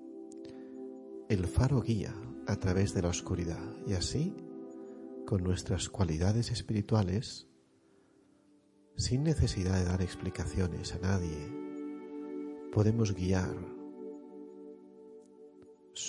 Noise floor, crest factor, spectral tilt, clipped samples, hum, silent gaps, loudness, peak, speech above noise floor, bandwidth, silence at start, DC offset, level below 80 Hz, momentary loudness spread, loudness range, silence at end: -66 dBFS; 20 dB; -6 dB/octave; under 0.1%; none; none; -33 LUFS; -14 dBFS; 34 dB; 11.5 kHz; 0 s; under 0.1%; -50 dBFS; 17 LU; 2 LU; 0 s